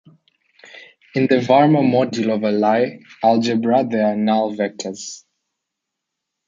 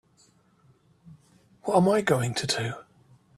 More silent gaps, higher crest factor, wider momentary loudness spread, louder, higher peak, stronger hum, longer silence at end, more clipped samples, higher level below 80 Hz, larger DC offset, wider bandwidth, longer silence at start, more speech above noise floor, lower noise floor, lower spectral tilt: neither; about the same, 16 dB vs 20 dB; about the same, 14 LU vs 14 LU; first, -18 LUFS vs -25 LUFS; first, -2 dBFS vs -8 dBFS; neither; first, 1.3 s vs 0.55 s; neither; about the same, -66 dBFS vs -64 dBFS; neither; second, 7.6 kHz vs 14 kHz; second, 0.75 s vs 1.05 s; first, 64 dB vs 38 dB; first, -80 dBFS vs -62 dBFS; about the same, -6 dB/octave vs -5 dB/octave